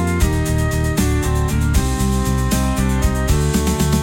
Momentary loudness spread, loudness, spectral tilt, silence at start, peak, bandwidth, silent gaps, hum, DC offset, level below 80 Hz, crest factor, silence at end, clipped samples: 1 LU; -18 LUFS; -5.5 dB/octave; 0 s; -4 dBFS; 17 kHz; none; none; under 0.1%; -22 dBFS; 12 dB; 0 s; under 0.1%